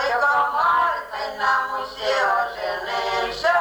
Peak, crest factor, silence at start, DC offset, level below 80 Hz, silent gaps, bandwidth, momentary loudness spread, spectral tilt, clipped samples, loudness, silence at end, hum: -8 dBFS; 14 dB; 0 s; under 0.1%; -54 dBFS; none; over 20 kHz; 8 LU; -2 dB/octave; under 0.1%; -21 LUFS; 0 s; none